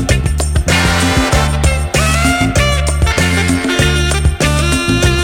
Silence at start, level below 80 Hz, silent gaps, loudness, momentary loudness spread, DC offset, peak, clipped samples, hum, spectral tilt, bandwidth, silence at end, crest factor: 0 s; -18 dBFS; none; -12 LUFS; 2 LU; under 0.1%; 0 dBFS; under 0.1%; none; -4.5 dB/octave; 16.5 kHz; 0 s; 12 dB